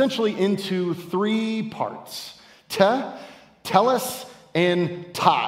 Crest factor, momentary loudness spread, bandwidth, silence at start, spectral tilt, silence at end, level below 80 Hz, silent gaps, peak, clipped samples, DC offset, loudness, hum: 22 dB; 15 LU; 16 kHz; 0 s; -5 dB/octave; 0 s; -70 dBFS; none; 0 dBFS; under 0.1%; under 0.1%; -23 LUFS; none